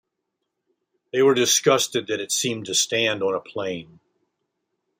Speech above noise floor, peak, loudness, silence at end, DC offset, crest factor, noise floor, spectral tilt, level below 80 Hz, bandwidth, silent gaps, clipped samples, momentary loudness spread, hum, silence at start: 58 dB; -4 dBFS; -21 LUFS; 1.15 s; under 0.1%; 20 dB; -80 dBFS; -2 dB/octave; -70 dBFS; 16 kHz; none; under 0.1%; 12 LU; none; 1.15 s